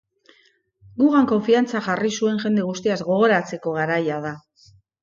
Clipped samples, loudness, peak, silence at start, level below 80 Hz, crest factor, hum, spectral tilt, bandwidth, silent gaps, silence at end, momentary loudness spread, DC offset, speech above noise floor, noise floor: under 0.1%; -21 LUFS; -6 dBFS; 0.95 s; -64 dBFS; 16 dB; none; -5.5 dB/octave; 7.4 kHz; none; 0.65 s; 10 LU; under 0.1%; 40 dB; -60 dBFS